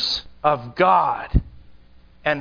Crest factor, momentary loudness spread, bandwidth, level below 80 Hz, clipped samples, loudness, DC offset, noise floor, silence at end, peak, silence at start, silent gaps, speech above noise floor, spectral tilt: 18 dB; 8 LU; 5.4 kHz; -32 dBFS; under 0.1%; -21 LUFS; under 0.1%; -48 dBFS; 0 s; -4 dBFS; 0 s; none; 29 dB; -5.5 dB/octave